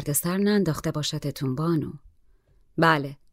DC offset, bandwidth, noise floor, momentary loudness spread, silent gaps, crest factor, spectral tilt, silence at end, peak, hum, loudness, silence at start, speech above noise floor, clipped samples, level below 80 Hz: under 0.1%; 16 kHz; -59 dBFS; 8 LU; none; 20 dB; -5 dB/octave; 0.2 s; -6 dBFS; none; -25 LUFS; 0 s; 34 dB; under 0.1%; -54 dBFS